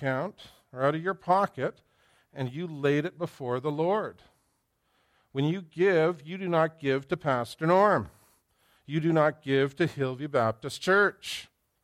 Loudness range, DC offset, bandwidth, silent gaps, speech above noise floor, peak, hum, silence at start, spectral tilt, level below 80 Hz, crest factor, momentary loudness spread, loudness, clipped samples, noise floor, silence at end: 5 LU; under 0.1%; 14.5 kHz; none; 47 dB; -10 dBFS; none; 0 s; -6.5 dB/octave; -68 dBFS; 18 dB; 13 LU; -28 LUFS; under 0.1%; -74 dBFS; 0.4 s